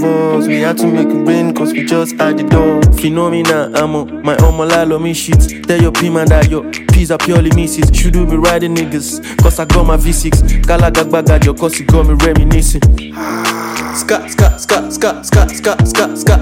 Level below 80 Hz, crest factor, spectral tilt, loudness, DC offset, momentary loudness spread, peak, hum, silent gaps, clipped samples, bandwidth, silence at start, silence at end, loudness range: -14 dBFS; 10 dB; -5.5 dB/octave; -11 LUFS; under 0.1%; 6 LU; 0 dBFS; none; none; under 0.1%; 17 kHz; 0 s; 0 s; 2 LU